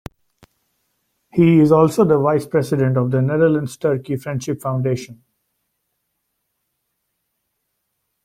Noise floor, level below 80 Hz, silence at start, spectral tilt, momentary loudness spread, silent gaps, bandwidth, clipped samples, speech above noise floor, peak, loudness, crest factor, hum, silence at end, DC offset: -74 dBFS; -54 dBFS; 1.35 s; -8 dB/octave; 12 LU; none; 15.5 kHz; under 0.1%; 57 dB; -2 dBFS; -17 LUFS; 18 dB; none; 3.1 s; under 0.1%